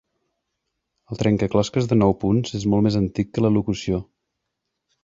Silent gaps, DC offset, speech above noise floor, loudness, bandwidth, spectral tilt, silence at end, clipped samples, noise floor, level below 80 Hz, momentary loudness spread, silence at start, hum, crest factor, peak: none; under 0.1%; 59 dB; -21 LUFS; 7.8 kHz; -7 dB/octave; 1 s; under 0.1%; -79 dBFS; -46 dBFS; 7 LU; 1.1 s; none; 18 dB; -4 dBFS